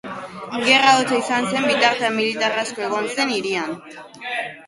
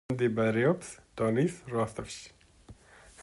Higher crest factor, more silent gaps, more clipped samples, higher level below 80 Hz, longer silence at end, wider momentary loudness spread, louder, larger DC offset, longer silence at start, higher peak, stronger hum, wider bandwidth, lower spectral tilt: about the same, 20 dB vs 18 dB; neither; neither; second, -66 dBFS vs -60 dBFS; about the same, 0 s vs 0 s; about the same, 18 LU vs 17 LU; first, -19 LUFS vs -30 LUFS; neither; about the same, 0.05 s vs 0.1 s; first, 0 dBFS vs -14 dBFS; neither; about the same, 11.5 kHz vs 11.5 kHz; second, -2.5 dB/octave vs -6.5 dB/octave